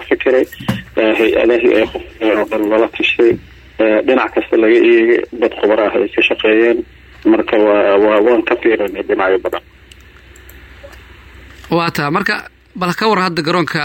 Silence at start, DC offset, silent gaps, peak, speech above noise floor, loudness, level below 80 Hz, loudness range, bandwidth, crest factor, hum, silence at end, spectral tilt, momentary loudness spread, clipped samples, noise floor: 0 s; under 0.1%; none; -2 dBFS; 28 dB; -13 LUFS; -44 dBFS; 8 LU; 16.5 kHz; 12 dB; none; 0 s; -6 dB/octave; 9 LU; under 0.1%; -41 dBFS